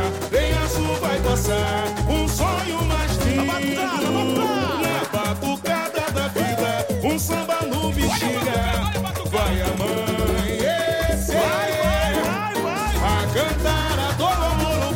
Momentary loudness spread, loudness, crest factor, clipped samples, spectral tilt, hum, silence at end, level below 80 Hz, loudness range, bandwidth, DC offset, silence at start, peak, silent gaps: 3 LU; -22 LUFS; 12 dB; under 0.1%; -4.5 dB/octave; none; 0 s; -30 dBFS; 1 LU; 17 kHz; under 0.1%; 0 s; -10 dBFS; none